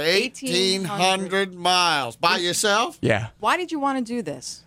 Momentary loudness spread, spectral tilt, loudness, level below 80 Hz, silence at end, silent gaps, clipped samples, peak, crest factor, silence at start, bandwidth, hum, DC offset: 6 LU; -3 dB/octave; -21 LUFS; -60 dBFS; 0.1 s; none; under 0.1%; -6 dBFS; 18 dB; 0 s; 16 kHz; none; under 0.1%